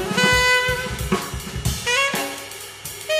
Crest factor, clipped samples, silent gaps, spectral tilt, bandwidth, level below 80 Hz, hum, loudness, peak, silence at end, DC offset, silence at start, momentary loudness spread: 18 dB; under 0.1%; none; -3 dB/octave; 15.5 kHz; -36 dBFS; none; -20 LUFS; -4 dBFS; 0 s; under 0.1%; 0 s; 16 LU